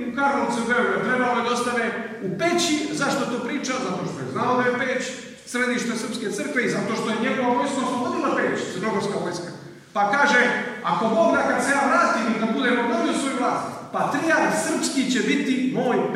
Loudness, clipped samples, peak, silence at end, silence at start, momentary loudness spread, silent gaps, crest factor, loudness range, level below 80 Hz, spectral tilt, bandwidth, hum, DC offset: -22 LUFS; under 0.1%; -6 dBFS; 0 s; 0 s; 9 LU; none; 18 dB; 4 LU; -66 dBFS; -4 dB/octave; 15 kHz; none; under 0.1%